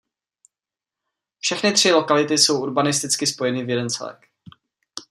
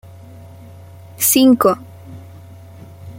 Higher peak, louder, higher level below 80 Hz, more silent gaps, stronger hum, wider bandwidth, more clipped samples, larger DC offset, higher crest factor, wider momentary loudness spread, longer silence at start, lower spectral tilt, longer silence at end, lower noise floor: about the same, -2 dBFS vs -2 dBFS; second, -19 LUFS vs -13 LUFS; second, -68 dBFS vs -56 dBFS; neither; neither; about the same, 15 kHz vs 16.5 kHz; neither; neither; about the same, 20 dB vs 18 dB; second, 12 LU vs 27 LU; first, 1.45 s vs 1.2 s; about the same, -2.5 dB/octave vs -3.5 dB/octave; about the same, 0.1 s vs 0 s; first, -89 dBFS vs -38 dBFS